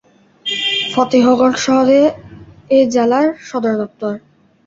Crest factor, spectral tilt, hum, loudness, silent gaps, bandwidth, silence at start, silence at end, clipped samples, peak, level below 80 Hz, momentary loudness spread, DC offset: 14 dB; -4 dB/octave; none; -14 LUFS; none; 7.8 kHz; 0.45 s; 0.5 s; under 0.1%; -2 dBFS; -54 dBFS; 13 LU; under 0.1%